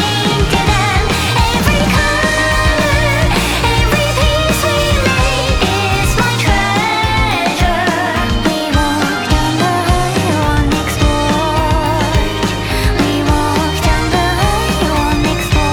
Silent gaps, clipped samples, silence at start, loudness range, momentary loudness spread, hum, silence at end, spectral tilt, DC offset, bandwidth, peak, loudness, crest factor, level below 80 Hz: none; under 0.1%; 0 s; 2 LU; 2 LU; none; 0 s; -4.5 dB/octave; under 0.1%; over 20 kHz; 0 dBFS; -13 LUFS; 12 dB; -20 dBFS